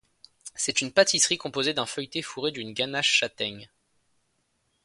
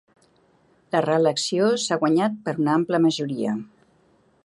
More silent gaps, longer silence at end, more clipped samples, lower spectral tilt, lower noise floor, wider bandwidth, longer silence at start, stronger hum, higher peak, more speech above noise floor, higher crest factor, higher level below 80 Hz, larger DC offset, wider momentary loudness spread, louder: neither; first, 1.2 s vs 0.8 s; neither; second, -1.5 dB/octave vs -5 dB/octave; first, -73 dBFS vs -61 dBFS; about the same, 11.5 kHz vs 11.5 kHz; second, 0.45 s vs 0.95 s; neither; about the same, -4 dBFS vs -6 dBFS; first, 46 dB vs 39 dB; first, 24 dB vs 18 dB; about the same, -68 dBFS vs -70 dBFS; neither; first, 12 LU vs 6 LU; second, -25 LUFS vs -22 LUFS